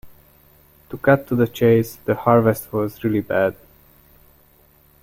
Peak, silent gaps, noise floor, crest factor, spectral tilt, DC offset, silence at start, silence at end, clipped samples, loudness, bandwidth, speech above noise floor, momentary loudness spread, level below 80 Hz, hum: -2 dBFS; none; -54 dBFS; 18 dB; -7.5 dB/octave; under 0.1%; 0.05 s; 1.5 s; under 0.1%; -19 LUFS; 16.5 kHz; 36 dB; 8 LU; -52 dBFS; none